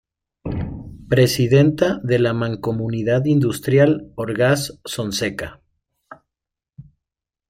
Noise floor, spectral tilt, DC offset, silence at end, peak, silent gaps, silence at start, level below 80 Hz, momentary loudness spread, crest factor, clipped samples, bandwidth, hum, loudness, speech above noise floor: -86 dBFS; -6 dB/octave; under 0.1%; 0.65 s; -2 dBFS; none; 0.45 s; -46 dBFS; 14 LU; 18 dB; under 0.1%; 16 kHz; none; -19 LUFS; 68 dB